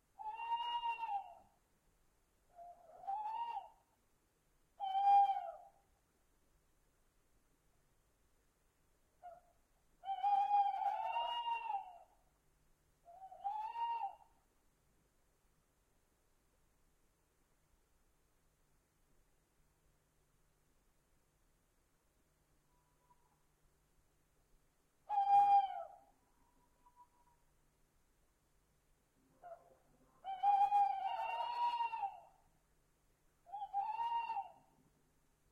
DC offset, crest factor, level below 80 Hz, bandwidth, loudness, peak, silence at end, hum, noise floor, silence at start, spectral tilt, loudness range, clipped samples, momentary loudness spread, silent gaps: under 0.1%; 20 dB; -78 dBFS; 8.4 kHz; -38 LUFS; -22 dBFS; 1 s; none; -77 dBFS; 0.2 s; -2 dB/octave; 11 LU; under 0.1%; 22 LU; none